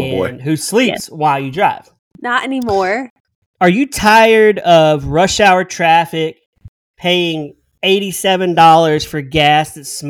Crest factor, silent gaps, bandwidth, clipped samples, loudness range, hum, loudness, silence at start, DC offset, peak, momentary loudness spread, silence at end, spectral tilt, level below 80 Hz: 14 dB; 1.99-2.11 s, 3.10-3.25 s, 3.35-3.54 s, 6.46-6.53 s, 6.68-6.94 s; 19 kHz; under 0.1%; 5 LU; none; -13 LUFS; 0 s; under 0.1%; 0 dBFS; 12 LU; 0 s; -4.5 dB/octave; -42 dBFS